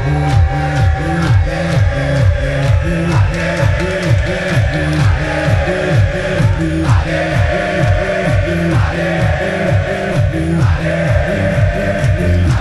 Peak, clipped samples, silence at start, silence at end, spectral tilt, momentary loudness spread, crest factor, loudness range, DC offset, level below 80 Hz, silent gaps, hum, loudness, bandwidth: 0 dBFS; under 0.1%; 0 s; 0 s; -7 dB/octave; 2 LU; 12 dB; 1 LU; under 0.1%; -22 dBFS; none; none; -14 LUFS; 12 kHz